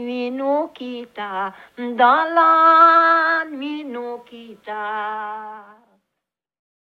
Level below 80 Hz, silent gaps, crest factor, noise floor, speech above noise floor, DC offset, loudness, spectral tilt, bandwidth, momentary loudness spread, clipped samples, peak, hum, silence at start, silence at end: -74 dBFS; none; 16 dB; -82 dBFS; 63 dB; under 0.1%; -16 LUFS; -5 dB/octave; 6.6 kHz; 21 LU; under 0.1%; -2 dBFS; none; 0 s; 1.3 s